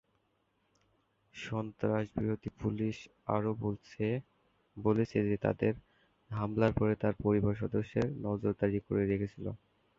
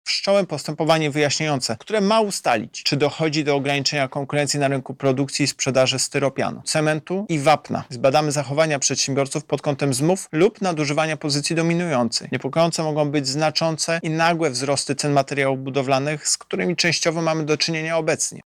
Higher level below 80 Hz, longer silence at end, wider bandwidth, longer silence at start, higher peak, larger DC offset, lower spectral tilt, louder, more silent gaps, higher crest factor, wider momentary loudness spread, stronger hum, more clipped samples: first, -56 dBFS vs -64 dBFS; first, 0.45 s vs 0.05 s; second, 7.4 kHz vs 16 kHz; first, 1.35 s vs 0.05 s; second, -14 dBFS vs -6 dBFS; neither; first, -9 dB/octave vs -4 dB/octave; second, -34 LUFS vs -21 LUFS; neither; first, 20 dB vs 14 dB; first, 9 LU vs 4 LU; neither; neither